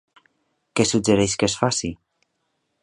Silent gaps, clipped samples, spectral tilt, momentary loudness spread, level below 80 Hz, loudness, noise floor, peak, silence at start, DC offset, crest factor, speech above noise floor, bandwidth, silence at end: none; under 0.1%; -4 dB/octave; 9 LU; -48 dBFS; -21 LUFS; -73 dBFS; -2 dBFS; 0.75 s; under 0.1%; 22 dB; 53 dB; 11.5 kHz; 0.9 s